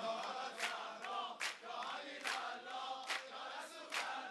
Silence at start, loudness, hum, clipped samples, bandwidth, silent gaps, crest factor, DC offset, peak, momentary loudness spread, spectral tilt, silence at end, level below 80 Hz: 0 s; -44 LUFS; none; under 0.1%; 12 kHz; none; 22 dB; under 0.1%; -24 dBFS; 4 LU; 0 dB/octave; 0 s; under -90 dBFS